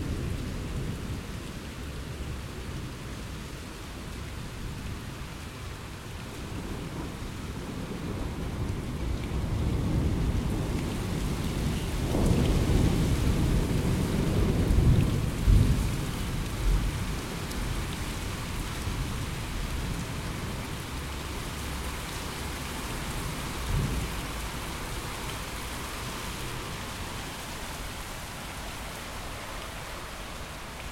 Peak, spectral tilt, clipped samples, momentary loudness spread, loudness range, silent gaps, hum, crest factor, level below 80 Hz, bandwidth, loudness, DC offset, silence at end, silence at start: -10 dBFS; -5.5 dB/octave; under 0.1%; 13 LU; 12 LU; none; none; 20 dB; -34 dBFS; 16.5 kHz; -32 LUFS; under 0.1%; 0 s; 0 s